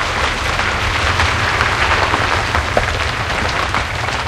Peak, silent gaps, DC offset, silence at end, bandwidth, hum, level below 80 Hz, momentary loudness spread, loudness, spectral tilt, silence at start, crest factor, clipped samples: 0 dBFS; none; under 0.1%; 0 s; 15.5 kHz; none; -26 dBFS; 4 LU; -16 LUFS; -3.5 dB/octave; 0 s; 16 dB; under 0.1%